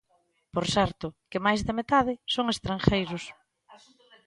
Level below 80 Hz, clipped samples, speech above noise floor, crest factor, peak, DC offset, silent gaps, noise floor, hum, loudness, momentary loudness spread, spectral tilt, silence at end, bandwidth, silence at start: -48 dBFS; under 0.1%; 43 dB; 24 dB; -4 dBFS; under 0.1%; none; -70 dBFS; none; -27 LUFS; 10 LU; -5 dB/octave; 0.5 s; 11.5 kHz; 0.55 s